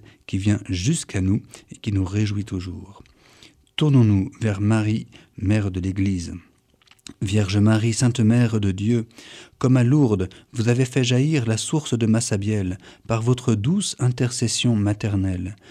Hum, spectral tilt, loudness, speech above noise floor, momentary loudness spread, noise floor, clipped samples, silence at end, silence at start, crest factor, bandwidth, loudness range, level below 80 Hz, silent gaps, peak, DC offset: none; -6 dB/octave; -22 LUFS; 36 dB; 12 LU; -57 dBFS; under 0.1%; 0.15 s; 0.3 s; 16 dB; 11.5 kHz; 4 LU; -50 dBFS; none; -6 dBFS; under 0.1%